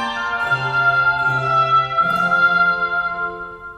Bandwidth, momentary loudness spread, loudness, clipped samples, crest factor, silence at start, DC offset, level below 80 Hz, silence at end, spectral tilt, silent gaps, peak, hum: 11.5 kHz; 8 LU; -17 LUFS; under 0.1%; 12 dB; 0 s; under 0.1%; -50 dBFS; 0 s; -5 dB/octave; none; -6 dBFS; none